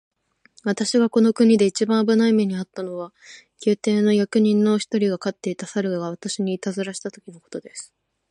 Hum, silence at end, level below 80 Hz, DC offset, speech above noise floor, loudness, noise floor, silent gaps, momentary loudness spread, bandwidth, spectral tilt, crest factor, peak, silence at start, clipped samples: none; 0.45 s; -70 dBFS; under 0.1%; 36 dB; -21 LUFS; -57 dBFS; none; 17 LU; 11 kHz; -5.5 dB/octave; 16 dB; -6 dBFS; 0.65 s; under 0.1%